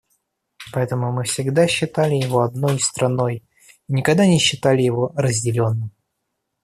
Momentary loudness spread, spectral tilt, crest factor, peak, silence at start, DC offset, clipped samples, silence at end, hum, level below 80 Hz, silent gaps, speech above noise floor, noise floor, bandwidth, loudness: 9 LU; -5 dB/octave; 18 dB; -2 dBFS; 0.6 s; under 0.1%; under 0.1%; 0.75 s; none; -56 dBFS; none; 58 dB; -76 dBFS; 14 kHz; -19 LUFS